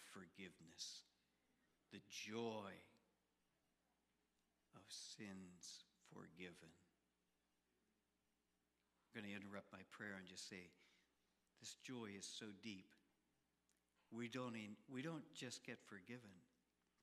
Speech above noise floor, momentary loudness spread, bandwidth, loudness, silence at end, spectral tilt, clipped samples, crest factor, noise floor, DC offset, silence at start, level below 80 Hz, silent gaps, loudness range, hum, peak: 33 dB; 11 LU; 14 kHz; -55 LUFS; 0.55 s; -3.5 dB/octave; under 0.1%; 22 dB; -88 dBFS; under 0.1%; 0 s; under -90 dBFS; none; 7 LU; none; -36 dBFS